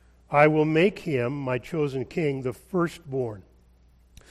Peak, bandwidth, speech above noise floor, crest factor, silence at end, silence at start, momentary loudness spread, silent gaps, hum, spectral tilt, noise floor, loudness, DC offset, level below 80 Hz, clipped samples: -4 dBFS; 13.5 kHz; 33 dB; 22 dB; 0.9 s; 0.3 s; 11 LU; none; none; -7.5 dB/octave; -57 dBFS; -25 LUFS; under 0.1%; -56 dBFS; under 0.1%